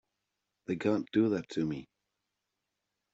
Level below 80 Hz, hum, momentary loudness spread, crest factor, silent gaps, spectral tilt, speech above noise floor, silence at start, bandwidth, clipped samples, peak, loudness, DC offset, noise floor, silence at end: -72 dBFS; none; 12 LU; 20 dB; none; -6.5 dB/octave; 55 dB; 0.7 s; 7.8 kHz; under 0.1%; -16 dBFS; -32 LUFS; under 0.1%; -86 dBFS; 1.3 s